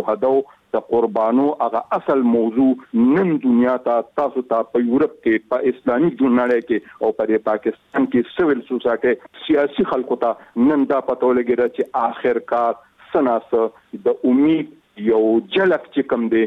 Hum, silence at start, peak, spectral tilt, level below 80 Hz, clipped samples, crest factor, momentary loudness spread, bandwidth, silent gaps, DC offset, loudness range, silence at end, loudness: none; 0 s; -6 dBFS; -8.5 dB/octave; -58 dBFS; under 0.1%; 12 dB; 6 LU; 4.2 kHz; none; under 0.1%; 2 LU; 0 s; -19 LUFS